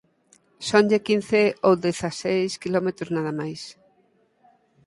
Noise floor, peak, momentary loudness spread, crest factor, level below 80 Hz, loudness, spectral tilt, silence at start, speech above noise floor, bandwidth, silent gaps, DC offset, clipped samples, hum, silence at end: -64 dBFS; -4 dBFS; 13 LU; 22 dB; -62 dBFS; -23 LUFS; -5 dB/octave; 0.6 s; 41 dB; 11.5 kHz; none; under 0.1%; under 0.1%; none; 1.15 s